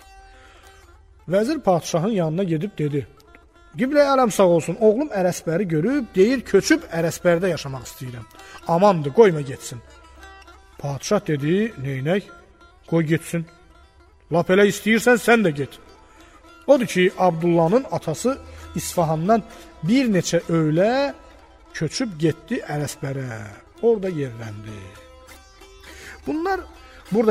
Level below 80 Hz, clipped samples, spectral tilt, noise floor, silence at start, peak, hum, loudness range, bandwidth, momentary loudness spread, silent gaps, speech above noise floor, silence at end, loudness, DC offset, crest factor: -50 dBFS; under 0.1%; -5.5 dB/octave; -51 dBFS; 0.15 s; -2 dBFS; none; 7 LU; 16 kHz; 17 LU; none; 31 dB; 0 s; -21 LUFS; under 0.1%; 20 dB